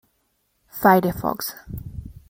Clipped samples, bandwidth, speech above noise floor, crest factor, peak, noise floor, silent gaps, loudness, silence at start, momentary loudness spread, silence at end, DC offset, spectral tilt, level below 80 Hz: under 0.1%; 16.5 kHz; 49 dB; 22 dB; -2 dBFS; -69 dBFS; none; -20 LUFS; 0.75 s; 20 LU; 0.15 s; under 0.1%; -6 dB/octave; -46 dBFS